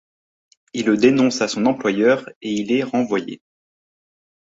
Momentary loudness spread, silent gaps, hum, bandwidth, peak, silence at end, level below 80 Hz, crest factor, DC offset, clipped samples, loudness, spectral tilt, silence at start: 11 LU; 2.36-2.41 s; none; 8 kHz; -2 dBFS; 1.15 s; -62 dBFS; 18 dB; under 0.1%; under 0.1%; -19 LUFS; -5 dB/octave; 0.75 s